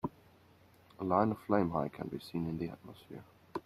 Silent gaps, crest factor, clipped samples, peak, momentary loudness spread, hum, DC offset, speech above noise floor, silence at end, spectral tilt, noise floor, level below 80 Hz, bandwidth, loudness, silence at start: none; 24 dB; under 0.1%; -14 dBFS; 20 LU; none; under 0.1%; 28 dB; 0.05 s; -8.5 dB/octave; -63 dBFS; -66 dBFS; 14.5 kHz; -35 LUFS; 0.05 s